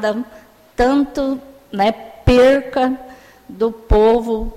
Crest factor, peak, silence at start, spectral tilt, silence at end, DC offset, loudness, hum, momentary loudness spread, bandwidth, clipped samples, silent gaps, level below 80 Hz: 14 dB; -2 dBFS; 0 s; -6.5 dB/octave; 0 s; under 0.1%; -16 LUFS; none; 16 LU; 14 kHz; under 0.1%; none; -28 dBFS